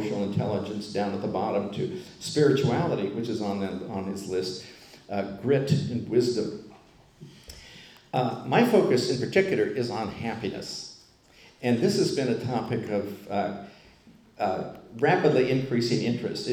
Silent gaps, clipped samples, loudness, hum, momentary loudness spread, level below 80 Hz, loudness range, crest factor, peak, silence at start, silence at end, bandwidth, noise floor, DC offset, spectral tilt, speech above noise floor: none; under 0.1%; -27 LUFS; none; 14 LU; -62 dBFS; 3 LU; 20 dB; -8 dBFS; 0 s; 0 s; 17.5 kHz; -55 dBFS; under 0.1%; -6 dB/octave; 29 dB